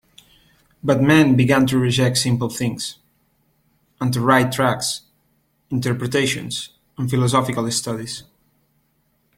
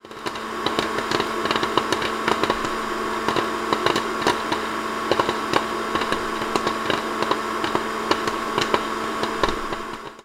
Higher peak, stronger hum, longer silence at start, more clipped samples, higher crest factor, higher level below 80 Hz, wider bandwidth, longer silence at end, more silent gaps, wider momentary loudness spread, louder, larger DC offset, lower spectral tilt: about the same, -2 dBFS vs -2 dBFS; neither; first, 0.85 s vs 0.05 s; neither; about the same, 20 dB vs 22 dB; second, -52 dBFS vs -46 dBFS; second, 16 kHz vs 18 kHz; first, 1.15 s vs 0 s; neither; first, 14 LU vs 4 LU; first, -19 LUFS vs -23 LUFS; neither; first, -5 dB/octave vs -3.5 dB/octave